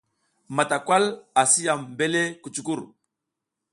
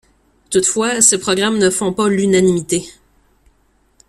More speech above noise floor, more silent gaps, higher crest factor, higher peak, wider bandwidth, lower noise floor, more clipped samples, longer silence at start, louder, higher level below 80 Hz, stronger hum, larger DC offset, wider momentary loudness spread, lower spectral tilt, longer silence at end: first, 61 dB vs 43 dB; neither; first, 22 dB vs 16 dB; second, -4 dBFS vs 0 dBFS; second, 11.5 kHz vs 15.5 kHz; first, -84 dBFS vs -58 dBFS; neither; about the same, 0.5 s vs 0.5 s; second, -23 LUFS vs -14 LUFS; second, -72 dBFS vs -50 dBFS; neither; neither; first, 12 LU vs 8 LU; about the same, -2.5 dB/octave vs -3.5 dB/octave; second, 0.9 s vs 1.2 s